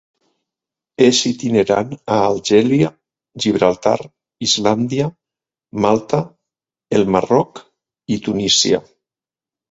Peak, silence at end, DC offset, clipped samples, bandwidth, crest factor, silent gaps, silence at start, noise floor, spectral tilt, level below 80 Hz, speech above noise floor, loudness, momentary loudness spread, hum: 0 dBFS; 0.9 s; under 0.1%; under 0.1%; 8.2 kHz; 18 dB; none; 1 s; under -90 dBFS; -4.5 dB/octave; -52 dBFS; over 74 dB; -16 LUFS; 9 LU; none